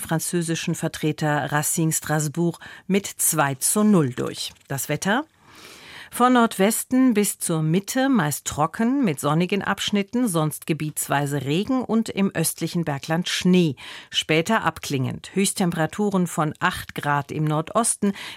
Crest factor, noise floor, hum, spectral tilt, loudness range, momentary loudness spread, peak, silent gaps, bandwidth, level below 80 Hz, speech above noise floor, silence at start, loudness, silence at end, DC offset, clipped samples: 18 dB; -46 dBFS; none; -4.5 dB/octave; 2 LU; 7 LU; -6 dBFS; none; 16.5 kHz; -58 dBFS; 24 dB; 0 s; -22 LUFS; 0 s; under 0.1%; under 0.1%